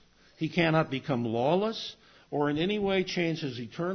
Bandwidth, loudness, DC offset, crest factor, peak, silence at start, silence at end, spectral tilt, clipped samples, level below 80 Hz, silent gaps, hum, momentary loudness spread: 6.6 kHz; -29 LUFS; under 0.1%; 18 dB; -10 dBFS; 0.4 s; 0 s; -6.5 dB/octave; under 0.1%; -62 dBFS; none; none; 11 LU